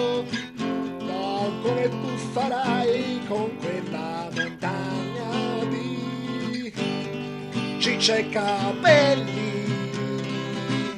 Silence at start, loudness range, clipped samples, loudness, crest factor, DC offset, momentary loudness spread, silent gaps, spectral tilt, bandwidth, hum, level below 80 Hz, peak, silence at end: 0 s; 6 LU; under 0.1%; -25 LUFS; 22 dB; under 0.1%; 9 LU; none; -5 dB/octave; 13 kHz; none; -62 dBFS; -2 dBFS; 0 s